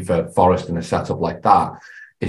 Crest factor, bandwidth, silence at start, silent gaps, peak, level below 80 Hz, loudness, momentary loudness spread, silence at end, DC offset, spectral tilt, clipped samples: 18 dB; 12 kHz; 0 s; none; 0 dBFS; -40 dBFS; -18 LUFS; 9 LU; 0 s; under 0.1%; -7 dB/octave; under 0.1%